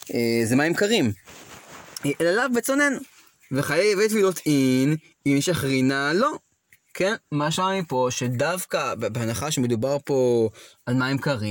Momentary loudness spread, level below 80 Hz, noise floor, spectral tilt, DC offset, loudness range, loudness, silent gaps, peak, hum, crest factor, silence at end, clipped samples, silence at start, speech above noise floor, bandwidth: 10 LU; -60 dBFS; -61 dBFS; -5 dB/octave; under 0.1%; 3 LU; -23 LUFS; none; -8 dBFS; none; 16 dB; 0 s; under 0.1%; 0.05 s; 38 dB; 17 kHz